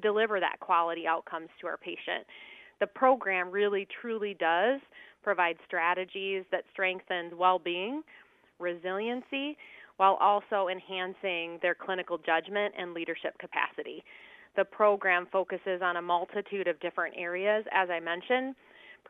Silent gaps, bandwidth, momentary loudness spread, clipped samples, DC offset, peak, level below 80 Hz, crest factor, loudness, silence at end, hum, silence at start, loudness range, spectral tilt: none; 4.1 kHz; 11 LU; under 0.1%; under 0.1%; -10 dBFS; -82 dBFS; 22 dB; -30 LUFS; 0.15 s; none; 0 s; 3 LU; -6.5 dB/octave